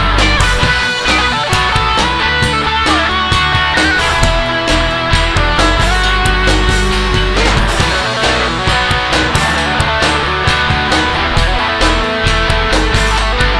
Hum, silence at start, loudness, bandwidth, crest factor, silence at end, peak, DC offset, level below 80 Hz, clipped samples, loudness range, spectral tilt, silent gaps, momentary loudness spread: none; 0 s; -12 LUFS; 11 kHz; 12 dB; 0 s; 0 dBFS; under 0.1%; -18 dBFS; under 0.1%; 1 LU; -4 dB/octave; none; 2 LU